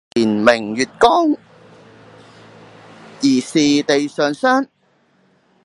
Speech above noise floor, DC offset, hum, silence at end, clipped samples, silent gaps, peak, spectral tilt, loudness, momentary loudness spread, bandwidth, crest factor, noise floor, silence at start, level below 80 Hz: 44 dB; under 0.1%; none; 1 s; under 0.1%; none; 0 dBFS; -4 dB/octave; -16 LUFS; 6 LU; 11.5 kHz; 18 dB; -59 dBFS; 0.15 s; -58 dBFS